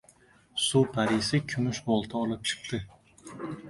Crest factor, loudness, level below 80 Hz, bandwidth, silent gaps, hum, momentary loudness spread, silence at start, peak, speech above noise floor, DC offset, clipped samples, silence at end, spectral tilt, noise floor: 18 dB; -29 LUFS; -58 dBFS; 11.5 kHz; none; none; 15 LU; 0.55 s; -12 dBFS; 32 dB; under 0.1%; under 0.1%; 0 s; -4.5 dB/octave; -60 dBFS